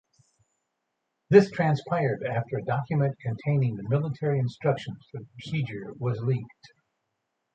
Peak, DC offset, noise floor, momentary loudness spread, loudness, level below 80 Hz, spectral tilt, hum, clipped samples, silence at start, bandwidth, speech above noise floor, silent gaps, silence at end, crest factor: -4 dBFS; under 0.1%; -80 dBFS; 14 LU; -27 LUFS; -64 dBFS; -8.5 dB/octave; none; under 0.1%; 1.3 s; 8 kHz; 54 dB; none; 1.1 s; 24 dB